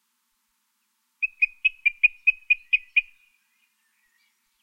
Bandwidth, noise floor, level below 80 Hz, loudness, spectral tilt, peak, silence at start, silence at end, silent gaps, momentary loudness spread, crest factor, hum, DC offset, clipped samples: 5.8 kHz; -73 dBFS; -66 dBFS; -22 LUFS; 3 dB/octave; -6 dBFS; 1.2 s; 1.6 s; none; 5 LU; 22 dB; none; under 0.1%; under 0.1%